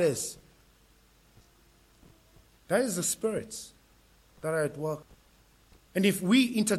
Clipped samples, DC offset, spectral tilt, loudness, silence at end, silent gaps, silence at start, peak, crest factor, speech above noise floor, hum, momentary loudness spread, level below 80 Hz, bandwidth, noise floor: under 0.1%; under 0.1%; -4 dB/octave; -29 LUFS; 0 s; none; 0 s; -12 dBFS; 20 dB; 34 dB; none; 17 LU; -64 dBFS; 16 kHz; -62 dBFS